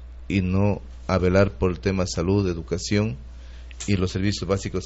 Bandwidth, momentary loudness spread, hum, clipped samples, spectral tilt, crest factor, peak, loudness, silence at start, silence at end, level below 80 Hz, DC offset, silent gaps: 8 kHz; 12 LU; none; under 0.1%; -6.5 dB/octave; 18 dB; -6 dBFS; -24 LUFS; 0 s; 0 s; -38 dBFS; under 0.1%; none